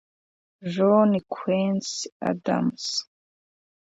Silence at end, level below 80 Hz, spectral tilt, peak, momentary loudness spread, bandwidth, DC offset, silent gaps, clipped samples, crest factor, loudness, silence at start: 0.85 s; -68 dBFS; -5.5 dB/octave; -6 dBFS; 11 LU; 7.8 kHz; under 0.1%; 2.12-2.20 s; under 0.1%; 18 dB; -24 LUFS; 0.6 s